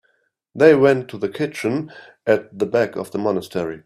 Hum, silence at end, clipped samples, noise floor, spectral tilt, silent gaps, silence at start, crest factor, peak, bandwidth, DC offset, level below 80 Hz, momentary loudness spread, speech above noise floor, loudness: none; 0.05 s; under 0.1%; -66 dBFS; -6.5 dB/octave; none; 0.55 s; 20 dB; 0 dBFS; 13.5 kHz; under 0.1%; -62 dBFS; 14 LU; 47 dB; -19 LUFS